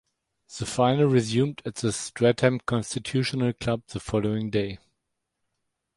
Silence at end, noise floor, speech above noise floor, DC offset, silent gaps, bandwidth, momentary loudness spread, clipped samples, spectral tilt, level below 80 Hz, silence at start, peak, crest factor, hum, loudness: 1.2 s; -80 dBFS; 55 dB; under 0.1%; none; 11.5 kHz; 10 LU; under 0.1%; -5.5 dB/octave; -54 dBFS; 0.5 s; -6 dBFS; 20 dB; none; -26 LUFS